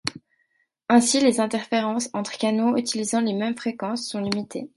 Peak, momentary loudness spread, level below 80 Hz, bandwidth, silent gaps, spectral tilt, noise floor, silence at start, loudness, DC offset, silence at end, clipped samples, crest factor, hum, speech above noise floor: -4 dBFS; 10 LU; -66 dBFS; 11.5 kHz; none; -3.5 dB/octave; -70 dBFS; 0.05 s; -23 LUFS; under 0.1%; 0.1 s; under 0.1%; 20 dB; none; 47 dB